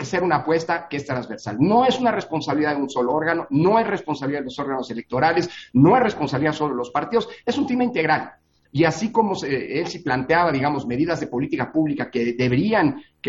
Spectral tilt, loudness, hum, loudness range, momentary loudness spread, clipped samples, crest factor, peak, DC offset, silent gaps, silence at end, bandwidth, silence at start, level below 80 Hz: -6.5 dB/octave; -21 LUFS; none; 2 LU; 9 LU; under 0.1%; 18 dB; -4 dBFS; under 0.1%; none; 0 s; 7.8 kHz; 0 s; -54 dBFS